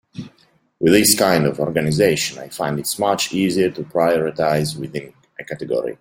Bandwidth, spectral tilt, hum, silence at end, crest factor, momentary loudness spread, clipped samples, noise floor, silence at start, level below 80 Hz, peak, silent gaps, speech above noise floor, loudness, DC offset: 16.5 kHz; -4 dB/octave; none; 0.05 s; 18 dB; 17 LU; under 0.1%; -58 dBFS; 0.15 s; -52 dBFS; 0 dBFS; none; 39 dB; -18 LUFS; under 0.1%